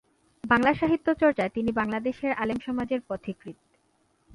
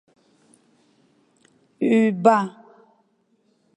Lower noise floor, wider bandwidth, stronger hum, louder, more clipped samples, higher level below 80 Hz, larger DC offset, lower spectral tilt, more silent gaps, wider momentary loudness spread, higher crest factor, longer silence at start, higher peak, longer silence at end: about the same, -68 dBFS vs -66 dBFS; about the same, 11.5 kHz vs 10.5 kHz; neither; second, -26 LUFS vs -20 LUFS; neither; first, -56 dBFS vs -78 dBFS; neither; about the same, -7 dB/octave vs -7 dB/octave; neither; first, 15 LU vs 10 LU; about the same, 20 dB vs 22 dB; second, 0.45 s vs 1.8 s; second, -8 dBFS vs -2 dBFS; second, 0.85 s vs 1.3 s